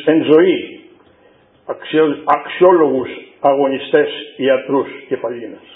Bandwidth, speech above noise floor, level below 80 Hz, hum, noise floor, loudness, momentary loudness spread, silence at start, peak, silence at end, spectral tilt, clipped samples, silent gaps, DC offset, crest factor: 4 kHz; 36 dB; -62 dBFS; none; -50 dBFS; -15 LUFS; 15 LU; 0 s; 0 dBFS; 0.15 s; -9 dB/octave; under 0.1%; none; under 0.1%; 16 dB